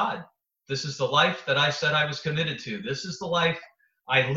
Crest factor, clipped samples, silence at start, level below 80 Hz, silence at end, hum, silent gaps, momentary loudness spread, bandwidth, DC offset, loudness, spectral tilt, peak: 20 dB; under 0.1%; 0 s; -64 dBFS; 0 s; none; none; 10 LU; 8 kHz; under 0.1%; -25 LUFS; -4 dB/octave; -6 dBFS